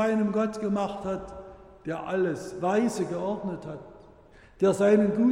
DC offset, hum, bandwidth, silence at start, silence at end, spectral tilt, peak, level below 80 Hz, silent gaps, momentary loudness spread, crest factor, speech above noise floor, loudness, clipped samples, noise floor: under 0.1%; none; 11.5 kHz; 0 s; 0 s; -7 dB/octave; -10 dBFS; -56 dBFS; none; 19 LU; 16 dB; 27 dB; -27 LUFS; under 0.1%; -53 dBFS